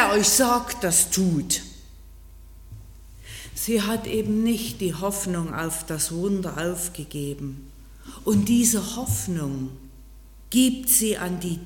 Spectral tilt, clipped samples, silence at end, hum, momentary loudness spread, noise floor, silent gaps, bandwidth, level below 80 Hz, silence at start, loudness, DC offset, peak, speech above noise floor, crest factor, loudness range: -3.5 dB/octave; under 0.1%; 0 s; none; 14 LU; -45 dBFS; none; 17.5 kHz; -44 dBFS; 0 s; -23 LUFS; under 0.1%; -4 dBFS; 22 dB; 20 dB; 5 LU